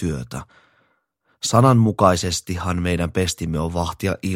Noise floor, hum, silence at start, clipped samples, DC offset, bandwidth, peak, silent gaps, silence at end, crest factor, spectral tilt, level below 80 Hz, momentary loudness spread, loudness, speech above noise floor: -66 dBFS; none; 0 s; under 0.1%; under 0.1%; 16.5 kHz; 0 dBFS; none; 0 s; 20 dB; -5.5 dB/octave; -40 dBFS; 12 LU; -20 LUFS; 47 dB